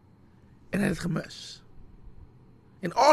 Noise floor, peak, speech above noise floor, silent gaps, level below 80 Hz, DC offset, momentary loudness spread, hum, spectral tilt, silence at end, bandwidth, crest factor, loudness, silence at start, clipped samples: -56 dBFS; -6 dBFS; 31 dB; none; -52 dBFS; under 0.1%; 16 LU; none; -5 dB/octave; 0 s; 13 kHz; 22 dB; -30 LUFS; 0.7 s; under 0.1%